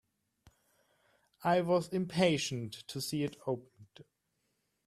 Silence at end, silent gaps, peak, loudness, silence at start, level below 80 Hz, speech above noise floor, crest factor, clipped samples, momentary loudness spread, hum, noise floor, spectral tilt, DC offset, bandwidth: 0.85 s; none; -14 dBFS; -34 LUFS; 1.4 s; -72 dBFS; 48 dB; 22 dB; under 0.1%; 11 LU; none; -81 dBFS; -5 dB/octave; under 0.1%; 14.5 kHz